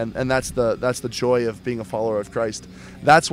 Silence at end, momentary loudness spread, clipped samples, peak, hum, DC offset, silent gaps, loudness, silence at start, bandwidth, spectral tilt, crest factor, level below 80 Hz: 0 s; 9 LU; under 0.1%; -2 dBFS; none; under 0.1%; none; -22 LUFS; 0 s; 16 kHz; -4.5 dB/octave; 20 dB; -46 dBFS